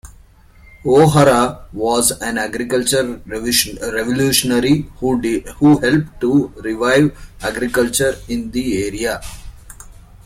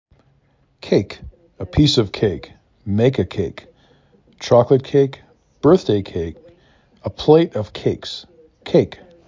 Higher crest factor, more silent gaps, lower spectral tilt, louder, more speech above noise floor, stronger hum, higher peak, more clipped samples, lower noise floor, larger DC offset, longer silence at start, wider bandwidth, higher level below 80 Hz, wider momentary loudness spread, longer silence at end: about the same, 16 dB vs 18 dB; neither; second, -4.5 dB/octave vs -7 dB/octave; about the same, -16 LUFS vs -18 LUFS; second, 29 dB vs 42 dB; neither; about the same, 0 dBFS vs -2 dBFS; neither; second, -45 dBFS vs -59 dBFS; neither; second, 0.05 s vs 0.85 s; first, 16.5 kHz vs 7.6 kHz; about the same, -38 dBFS vs -40 dBFS; second, 11 LU vs 18 LU; second, 0.1 s vs 0.35 s